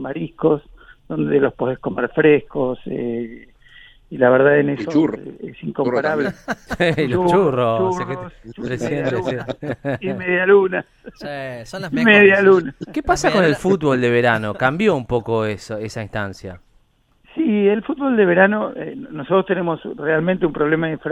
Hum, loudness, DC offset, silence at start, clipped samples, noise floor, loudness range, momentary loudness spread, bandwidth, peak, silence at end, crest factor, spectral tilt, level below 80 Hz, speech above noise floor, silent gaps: none; -18 LUFS; under 0.1%; 0 s; under 0.1%; -58 dBFS; 5 LU; 16 LU; 11.5 kHz; 0 dBFS; 0 s; 18 dB; -6.5 dB/octave; -46 dBFS; 40 dB; none